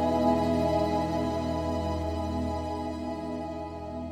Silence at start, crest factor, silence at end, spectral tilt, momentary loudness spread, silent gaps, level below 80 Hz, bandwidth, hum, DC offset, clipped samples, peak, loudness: 0 s; 16 dB; 0 s; -7 dB/octave; 10 LU; none; -42 dBFS; 14.5 kHz; none; under 0.1%; under 0.1%; -12 dBFS; -30 LUFS